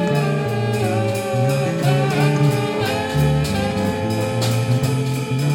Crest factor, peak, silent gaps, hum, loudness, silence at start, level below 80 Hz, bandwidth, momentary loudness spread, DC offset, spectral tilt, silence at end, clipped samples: 14 dB; -6 dBFS; none; none; -19 LUFS; 0 s; -40 dBFS; 16.5 kHz; 4 LU; under 0.1%; -6 dB/octave; 0 s; under 0.1%